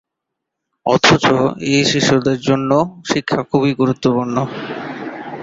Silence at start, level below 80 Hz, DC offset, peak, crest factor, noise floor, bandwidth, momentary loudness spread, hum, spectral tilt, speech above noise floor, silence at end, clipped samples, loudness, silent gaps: 0.85 s; -50 dBFS; under 0.1%; 0 dBFS; 16 dB; -79 dBFS; 7.8 kHz; 14 LU; none; -5 dB/octave; 64 dB; 0 s; under 0.1%; -16 LUFS; none